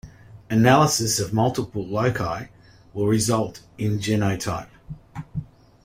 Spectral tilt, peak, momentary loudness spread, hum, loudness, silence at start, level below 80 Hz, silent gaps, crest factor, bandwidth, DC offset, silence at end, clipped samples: -5 dB/octave; -2 dBFS; 20 LU; none; -22 LUFS; 0.05 s; -50 dBFS; none; 22 dB; 16 kHz; under 0.1%; 0.4 s; under 0.1%